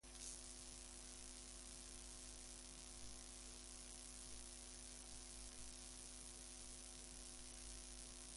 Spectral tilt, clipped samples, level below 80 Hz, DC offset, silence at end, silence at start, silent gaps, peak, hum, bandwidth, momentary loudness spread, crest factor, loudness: -1.5 dB/octave; under 0.1%; -62 dBFS; under 0.1%; 0 s; 0.05 s; none; -34 dBFS; none; 11.5 kHz; 1 LU; 22 dB; -55 LUFS